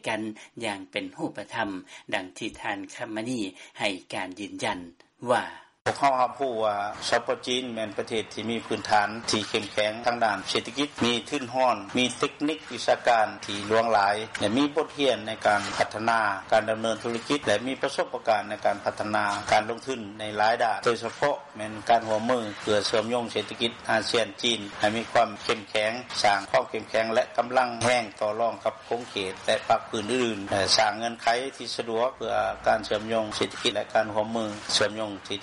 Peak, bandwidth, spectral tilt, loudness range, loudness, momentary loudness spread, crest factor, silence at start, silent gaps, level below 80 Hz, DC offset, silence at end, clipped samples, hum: -8 dBFS; 11.5 kHz; -3.5 dB/octave; 4 LU; -27 LUFS; 9 LU; 20 dB; 0.05 s; 5.81-5.85 s; -62 dBFS; under 0.1%; 0 s; under 0.1%; none